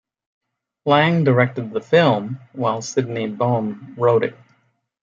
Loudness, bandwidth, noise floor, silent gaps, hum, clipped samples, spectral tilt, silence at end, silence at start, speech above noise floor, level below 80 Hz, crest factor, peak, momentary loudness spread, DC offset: -19 LUFS; 7.6 kHz; -63 dBFS; none; none; under 0.1%; -6 dB/octave; 0.7 s; 0.85 s; 45 dB; -64 dBFS; 18 dB; -2 dBFS; 12 LU; under 0.1%